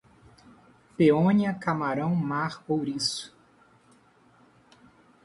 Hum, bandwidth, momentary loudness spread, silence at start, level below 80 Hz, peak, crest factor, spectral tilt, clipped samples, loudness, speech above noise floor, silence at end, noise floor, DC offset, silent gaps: none; 11.5 kHz; 11 LU; 1 s; -66 dBFS; -8 dBFS; 20 dB; -6 dB/octave; under 0.1%; -26 LUFS; 35 dB; 1.95 s; -60 dBFS; under 0.1%; none